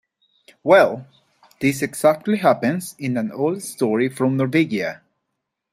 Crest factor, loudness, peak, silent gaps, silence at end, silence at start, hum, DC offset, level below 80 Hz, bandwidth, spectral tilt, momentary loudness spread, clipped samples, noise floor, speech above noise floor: 20 dB; -20 LUFS; -2 dBFS; none; 0.75 s; 0.65 s; none; under 0.1%; -64 dBFS; 16 kHz; -6 dB/octave; 11 LU; under 0.1%; -78 dBFS; 59 dB